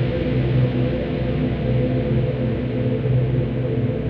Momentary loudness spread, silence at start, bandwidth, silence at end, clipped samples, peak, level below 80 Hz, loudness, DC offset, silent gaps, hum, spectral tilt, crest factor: 3 LU; 0 s; 4.8 kHz; 0 s; under 0.1%; -8 dBFS; -32 dBFS; -21 LUFS; under 0.1%; none; none; -10.5 dB/octave; 12 dB